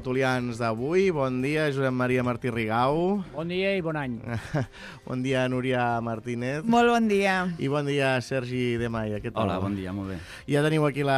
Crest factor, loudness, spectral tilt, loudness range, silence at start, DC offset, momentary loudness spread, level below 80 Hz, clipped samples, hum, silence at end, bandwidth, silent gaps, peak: 16 dB; -26 LUFS; -6.5 dB/octave; 3 LU; 0 s; under 0.1%; 9 LU; -54 dBFS; under 0.1%; none; 0 s; 14 kHz; none; -10 dBFS